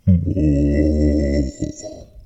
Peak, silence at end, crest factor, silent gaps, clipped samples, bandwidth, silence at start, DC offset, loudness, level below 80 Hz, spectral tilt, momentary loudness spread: -4 dBFS; 0.05 s; 14 dB; none; under 0.1%; 8.2 kHz; 0.05 s; under 0.1%; -18 LUFS; -24 dBFS; -8.5 dB/octave; 13 LU